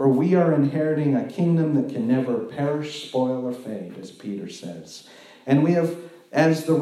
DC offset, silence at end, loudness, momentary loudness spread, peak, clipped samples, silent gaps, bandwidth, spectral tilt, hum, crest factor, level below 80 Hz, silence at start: under 0.1%; 0 s; -22 LUFS; 18 LU; -6 dBFS; under 0.1%; none; 13.5 kHz; -7.5 dB/octave; none; 16 dB; -76 dBFS; 0 s